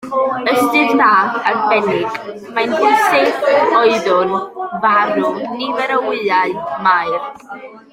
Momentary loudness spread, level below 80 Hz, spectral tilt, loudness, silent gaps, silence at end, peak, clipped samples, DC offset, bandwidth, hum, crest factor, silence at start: 11 LU; -60 dBFS; -4.5 dB/octave; -14 LUFS; none; 0.15 s; 0 dBFS; under 0.1%; under 0.1%; 16 kHz; none; 14 dB; 0 s